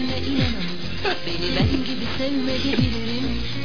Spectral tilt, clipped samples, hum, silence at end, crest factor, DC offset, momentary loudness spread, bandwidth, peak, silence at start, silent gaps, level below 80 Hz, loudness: -6 dB/octave; under 0.1%; none; 0 s; 16 dB; 5%; 5 LU; 5.4 kHz; -8 dBFS; 0 s; none; -36 dBFS; -24 LUFS